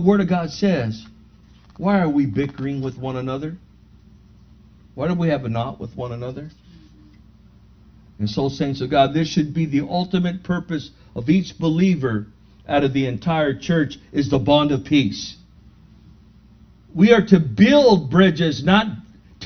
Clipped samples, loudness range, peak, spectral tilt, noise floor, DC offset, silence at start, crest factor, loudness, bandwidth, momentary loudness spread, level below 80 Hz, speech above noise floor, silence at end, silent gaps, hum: under 0.1%; 10 LU; 0 dBFS; -7 dB/octave; -49 dBFS; under 0.1%; 0 s; 20 dB; -19 LUFS; 6.6 kHz; 16 LU; -48 dBFS; 30 dB; 0 s; none; none